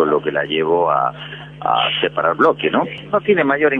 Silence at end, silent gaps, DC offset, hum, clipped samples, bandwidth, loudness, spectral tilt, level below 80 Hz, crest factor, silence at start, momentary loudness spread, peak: 0 s; none; under 0.1%; none; under 0.1%; 4.8 kHz; -17 LUFS; -7 dB/octave; -56 dBFS; 16 dB; 0 s; 7 LU; -2 dBFS